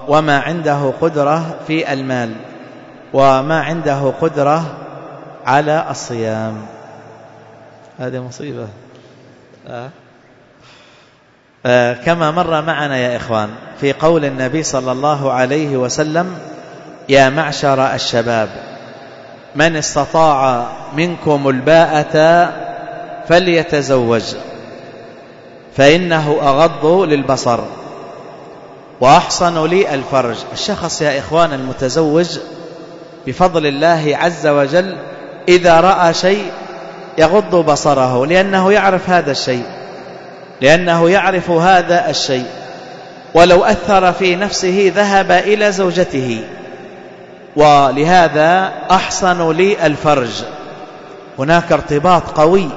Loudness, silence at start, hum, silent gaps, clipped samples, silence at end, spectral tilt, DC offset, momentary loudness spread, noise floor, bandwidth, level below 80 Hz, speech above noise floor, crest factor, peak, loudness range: -13 LUFS; 0 s; none; none; under 0.1%; 0 s; -5 dB/octave; under 0.1%; 20 LU; -50 dBFS; 8 kHz; -42 dBFS; 37 dB; 14 dB; 0 dBFS; 6 LU